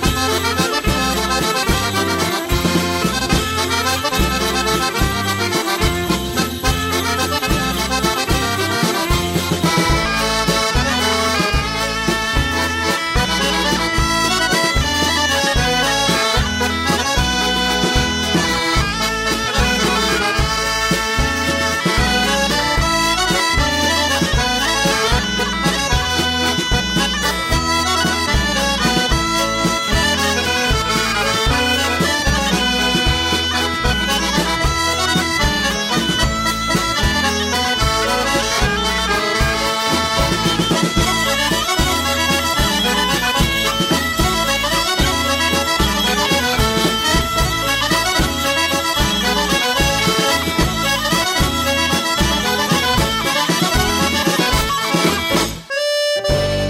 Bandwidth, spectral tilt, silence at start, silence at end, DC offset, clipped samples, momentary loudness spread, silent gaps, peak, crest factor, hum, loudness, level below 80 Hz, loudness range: 16.5 kHz; -3 dB/octave; 0 s; 0 s; under 0.1%; under 0.1%; 2 LU; none; -4 dBFS; 14 dB; none; -16 LUFS; -28 dBFS; 2 LU